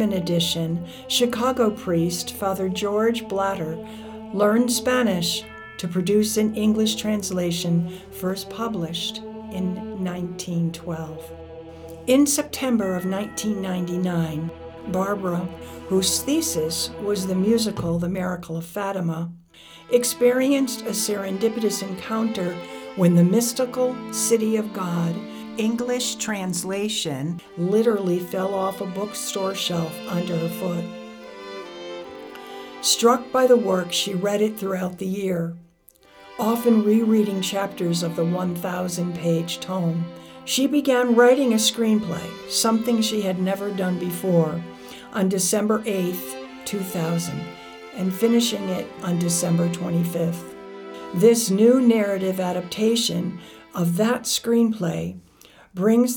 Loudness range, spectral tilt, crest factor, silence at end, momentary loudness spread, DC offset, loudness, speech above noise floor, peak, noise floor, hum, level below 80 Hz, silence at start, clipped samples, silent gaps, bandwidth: 5 LU; -4.5 dB/octave; 18 dB; 0 s; 15 LU; under 0.1%; -22 LUFS; 32 dB; -6 dBFS; -54 dBFS; none; -56 dBFS; 0 s; under 0.1%; none; over 20 kHz